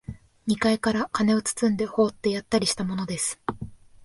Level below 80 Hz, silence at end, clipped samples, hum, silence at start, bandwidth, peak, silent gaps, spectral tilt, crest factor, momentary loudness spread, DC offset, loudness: -54 dBFS; 0 s; under 0.1%; none; 0.1 s; 11.5 kHz; -8 dBFS; none; -4 dB/octave; 16 dB; 12 LU; under 0.1%; -25 LUFS